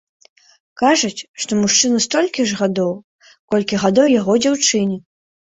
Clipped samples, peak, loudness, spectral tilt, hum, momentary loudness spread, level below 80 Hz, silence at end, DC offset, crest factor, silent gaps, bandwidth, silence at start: under 0.1%; -2 dBFS; -16 LUFS; -3.5 dB/octave; none; 9 LU; -58 dBFS; 0.6 s; under 0.1%; 16 dB; 1.29-1.34 s, 3.04-3.19 s, 3.39-3.48 s; 8.2 kHz; 0.75 s